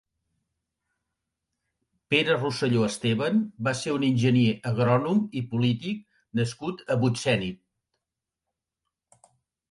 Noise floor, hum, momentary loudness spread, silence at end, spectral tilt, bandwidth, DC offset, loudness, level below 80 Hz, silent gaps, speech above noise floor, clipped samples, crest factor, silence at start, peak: -87 dBFS; none; 8 LU; 2.15 s; -6 dB/octave; 11.5 kHz; under 0.1%; -25 LUFS; -62 dBFS; none; 62 dB; under 0.1%; 20 dB; 2.1 s; -8 dBFS